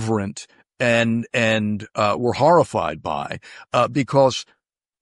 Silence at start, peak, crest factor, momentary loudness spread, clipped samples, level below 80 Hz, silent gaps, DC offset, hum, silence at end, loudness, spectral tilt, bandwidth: 0 s; -4 dBFS; 16 dB; 13 LU; under 0.1%; -56 dBFS; none; under 0.1%; none; 0.6 s; -20 LUFS; -5.5 dB/octave; 11.5 kHz